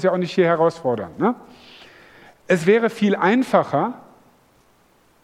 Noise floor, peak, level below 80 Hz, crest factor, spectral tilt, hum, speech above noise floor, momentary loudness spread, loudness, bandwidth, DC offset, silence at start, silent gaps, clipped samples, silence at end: -57 dBFS; -2 dBFS; -64 dBFS; 20 dB; -6.5 dB/octave; none; 38 dB; 8 LU; -19 LUFS; 13.5 kHz; under 0.1%; 0 s; none; under 0.1%; 1.25 s